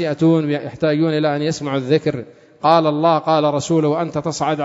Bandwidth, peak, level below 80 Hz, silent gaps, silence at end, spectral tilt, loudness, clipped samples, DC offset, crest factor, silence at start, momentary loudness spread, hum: 7.8 kHz; 0 dBFS; -58 dBFS; none; 0 s; -6 dB/octave; -18 LUFS; under 0.1%; under 0.1%; 18 dB; 0 s; 7 LU; none